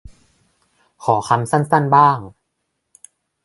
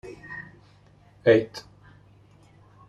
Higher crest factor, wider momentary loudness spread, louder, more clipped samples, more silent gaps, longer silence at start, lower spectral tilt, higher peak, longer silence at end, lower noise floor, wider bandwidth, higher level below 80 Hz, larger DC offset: about the same, 20 dB vs 22 dB; second, 11 LU vs 22 LU; first, -16 LUFS vs -23 LUFS; neither; neither; first, 1 s vs 0.05 s; about the same, -6.5 dB/octave vs -6.5 dB/octave; first, 0 dBFS vs -6 dBFS; second, 1.15 s vs 1.3 s; first, -74 dBFS vs -56 dBFS; about the same, 11.5 kHz vs 11.5 kHz; first, -54 dBFS vs -62 dBFS; neither